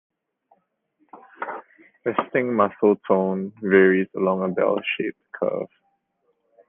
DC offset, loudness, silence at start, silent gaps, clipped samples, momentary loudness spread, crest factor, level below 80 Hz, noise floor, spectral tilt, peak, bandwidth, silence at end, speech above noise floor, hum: under 0.1%; -22 LUFS; 1.15 s; none; under 0.1%; 16 LU; 20 dB; -72 dBFS; -71 dBFS; -10 dB/octave; -4 dBFS; 3.7 kHz; 1.05 s; 49 dB; none